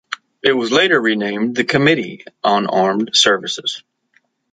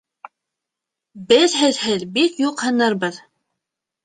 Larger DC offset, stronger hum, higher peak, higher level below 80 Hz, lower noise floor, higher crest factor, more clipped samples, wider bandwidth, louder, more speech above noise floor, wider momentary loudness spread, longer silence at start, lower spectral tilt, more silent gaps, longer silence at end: neither; neither; about the same, 0 dBFS vs -2 dBFS; first, -58 dBFS vs -64 dBFS; second, -61 dBFS vs -84 dBFS; about the same, 16 dB vs 20 dB; neither; about the same, 9.4 kHz vs 9.6 kHz; about the same, -16 LUFS vs -18 LUFS; second, 45 dB vs 66 dB; first, 10 LU vs 7 LU; second, 0.1 s vs 1.15 s; about the same, -3.5 dB/octave vs -3 dB/octave; neither; about the same, 0.75 s vs 0.85 s